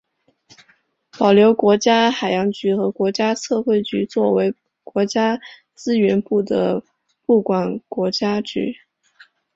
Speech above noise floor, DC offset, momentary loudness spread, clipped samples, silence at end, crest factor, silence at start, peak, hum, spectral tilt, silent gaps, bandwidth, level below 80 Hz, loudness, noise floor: 42 dB; under 0.1%; 12 LU; under 0.1%; 0.85 s; 18 dB; 1.15 s; -2 dBFS; none; -5.5 dB/octave; none; 7.8 kHz; -62 dBFS; -19 LUFS; -60 dBFS